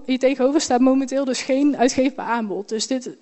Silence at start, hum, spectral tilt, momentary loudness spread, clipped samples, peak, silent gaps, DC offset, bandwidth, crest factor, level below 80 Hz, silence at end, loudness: 0 s; none; -3.5 dB/octave; 7 LU; under 0.1%; -4 dBFS; none; under 0.1%; 8.4 kHz; 14 dB; -58 dBFS; 0.05 s; -20 LUFS